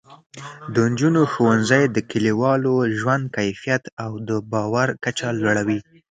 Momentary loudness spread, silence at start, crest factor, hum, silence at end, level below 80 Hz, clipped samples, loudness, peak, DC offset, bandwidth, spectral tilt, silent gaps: 9 LU; 0.1 s; 18 dB; none; 0.3 s; -58 dBFS; under 0.1%; -20 LUFS; -2 dBFS; under 0.1%; 9.4 kHz; -6 dB/octave; 0.26-0.30 s, 3.92-3.97 s